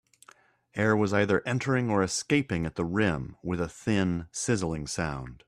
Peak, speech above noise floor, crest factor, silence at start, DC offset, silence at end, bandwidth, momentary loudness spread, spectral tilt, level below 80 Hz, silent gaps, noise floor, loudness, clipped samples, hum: -10 dBFS; 31 dB; 18 dB; 0.75 s; under 0.1%; 0.1 s; 13.5 kHz; 8 LU; -5.5 dB/octave; -52 dBFS; none; -59 dBFS; -28 LUFS; under 0.1%; none